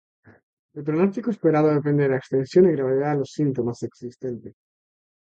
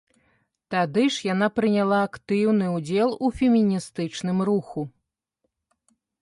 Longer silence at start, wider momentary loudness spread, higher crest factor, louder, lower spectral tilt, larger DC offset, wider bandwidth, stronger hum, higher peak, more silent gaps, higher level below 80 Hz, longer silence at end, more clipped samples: about the same, 0.75 s vs 0.7 s; first, 15 LU vs 8 LU; about the same, 18 dB vs 14 dB; about the same, -22 LUFS vs -23 LUFS; first, -8.5 dB/octave vs -6 dB/octave; neither; second, 8 kHz vs 11.5 kHz; neither; first, -6 dBFS vs -10 dBFS; neither; second, -64 dBFS vs -56 dBFS; second, 0.9 s vs 1.35 s; neither